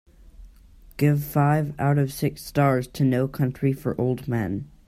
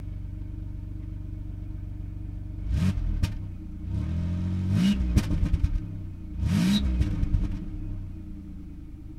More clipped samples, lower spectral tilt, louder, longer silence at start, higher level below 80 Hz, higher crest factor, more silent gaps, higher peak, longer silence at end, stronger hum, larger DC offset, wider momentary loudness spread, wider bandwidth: neither; about the same, -7.5 dB/octave vs -7 dB/octave; first, -24 LUFS vs -30 LUFS; first, 0.4 s vs 0 s; second, -50 dBFS vs -32 dBFS; about the same, 16 dB vs 20 dB; neither; about the same, -8 dBFS vs -8 dBFS; first, 0.25 s vs 0 s; neither; second, under 0.1% vs 0.2%; second, 6 LU vs 14 LU; first, 15.5 kHz vs 14 kHz